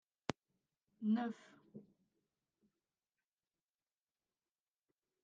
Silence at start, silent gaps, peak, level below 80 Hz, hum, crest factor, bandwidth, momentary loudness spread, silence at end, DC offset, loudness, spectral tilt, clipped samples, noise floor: 0.3 s; none; -18 dBFS; -82 dBFS; none; 30 dB; 8.8 kHz; 22 LU; 3.45 s; under 0.1%; -42 LUFS; -6.5 dB/octave; under 0.1%; under -90 dBFS